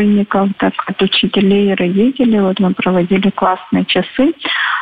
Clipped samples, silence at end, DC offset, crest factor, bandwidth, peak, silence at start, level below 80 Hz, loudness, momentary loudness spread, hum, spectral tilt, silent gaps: under 0.1%; 0 s; under 0.1%; 12 dB; 4.9 kHz; -2 dBFS; 0 s; -48 dBFS; -13 LUFS; 4 LU; none; -8.5 dB/octave; none